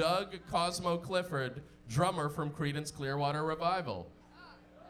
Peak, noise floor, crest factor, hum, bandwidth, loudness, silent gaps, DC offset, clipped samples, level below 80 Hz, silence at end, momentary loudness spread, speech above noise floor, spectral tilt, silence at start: -14 dBFS; -56 dBFS; 20 dB; 60 Hz at -60 dBFS; 15 kHz; -35 LUFS; none; under 0.1%; under 0.1%; -60 dBFS; 0 s; 11 LU; 21 dB; -5 dB/octave; 0 s